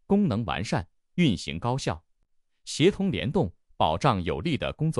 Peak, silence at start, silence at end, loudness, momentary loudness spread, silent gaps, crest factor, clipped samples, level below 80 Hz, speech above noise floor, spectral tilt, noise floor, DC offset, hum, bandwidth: -8 dBFS; 0.1 s; 0 s; -27 LUFS; 9 LU; none; 18 dB; under 0.1%; -48 dBFS; 43 dB; -6 dB/octave; -68 dBFS; under 0.1%; none; 11.5 kHz